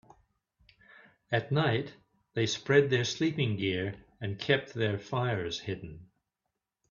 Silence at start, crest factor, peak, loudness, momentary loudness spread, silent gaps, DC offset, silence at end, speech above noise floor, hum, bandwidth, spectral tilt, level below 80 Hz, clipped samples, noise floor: 1.3 s; 22 dB; -10 dBFS; -31 LUFS; 14 LU; none; under 0.1%; 0.85 s; 56 dB; none; 7.2 kHz; -5.5 dB/octave; -64 dBFS; under 0.1%; -86 dBFS